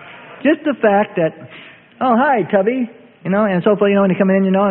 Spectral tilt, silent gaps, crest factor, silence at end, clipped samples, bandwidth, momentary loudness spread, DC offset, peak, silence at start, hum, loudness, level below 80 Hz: -12.5 dB/octave; none; 14 dB; 0 s; under 0.1%; 4 kHz; 12 LU; under 0.1%; 0 dBFS; 0 s; none; -16 LUFS; -60 dBFS